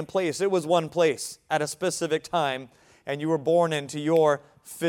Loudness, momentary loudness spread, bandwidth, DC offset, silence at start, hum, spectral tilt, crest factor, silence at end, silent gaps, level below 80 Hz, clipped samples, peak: -25 LUFS; 11 LU; 16.5 kHz; under 0.1%; 0 s; none; -4.5 dB/octave; 18 dB; 0 s; none; -70 dBFS; under 0.1%; -8 dBFS